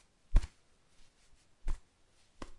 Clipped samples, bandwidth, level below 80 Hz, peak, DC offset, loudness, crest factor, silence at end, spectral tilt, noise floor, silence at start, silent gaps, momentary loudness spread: under 0.1%; 10.5 kHz; -38 dBFS; -12 dBFS; under 0.1%; -41 LUFS; 24 dB; 0 s; -6 dB/octave; -67 dBFS; 0.3 s; none; 15 LU